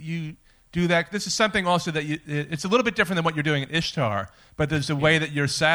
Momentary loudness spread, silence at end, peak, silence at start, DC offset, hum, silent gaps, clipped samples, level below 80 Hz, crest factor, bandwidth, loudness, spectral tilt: 10 LU; 0 s; -6 dBFS; 0 s; under 0.1%; none; none; under 0.1%; -52 dBFS; 18 dB; 19.5 kHz; -24 LUFS; -4.5 dB/octave